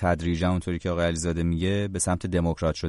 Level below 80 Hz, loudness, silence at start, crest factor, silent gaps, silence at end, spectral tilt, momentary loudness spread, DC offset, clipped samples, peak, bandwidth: -40 dBFS; -26 LUFS; 0 s; 14 dB; none; 0 s; -5.5 dB/octave; 1 LU; under 0.1%; under 0.1%; -10 dBFS; 11.5 kHz